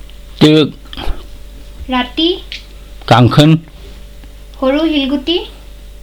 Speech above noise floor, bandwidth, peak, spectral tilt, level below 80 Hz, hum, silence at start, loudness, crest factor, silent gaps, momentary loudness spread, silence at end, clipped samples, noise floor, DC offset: 22 dB; 17.5 kHz; 0 dBFS; -6.5 dB/octave; -30 dBFS; none; 0.1 s; -12 LUFS; 14 dB; none; 20 LU; 0.05 s; under 0.1%; -32 dBFS; under 0.1%